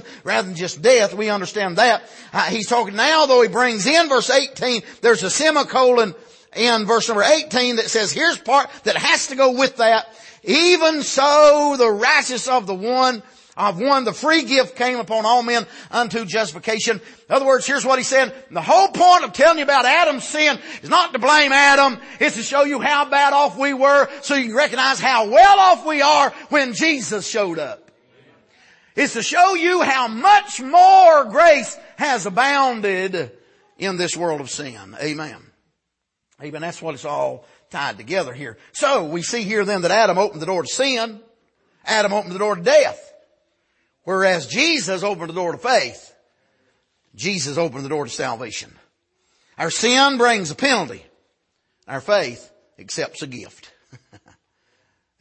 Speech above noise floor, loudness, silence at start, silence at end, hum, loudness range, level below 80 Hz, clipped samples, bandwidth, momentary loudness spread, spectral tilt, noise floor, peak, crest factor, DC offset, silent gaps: 61 dB; -17 LUFS; 0.05 s; 1.25 s; none; 12 LU; -62 dBFS; under 0.1%; 8.8 kHz; 14 LU; -2.5 dB/octave; -78 dBFS; -2 dBFS; 16 dB; under 0.1%; none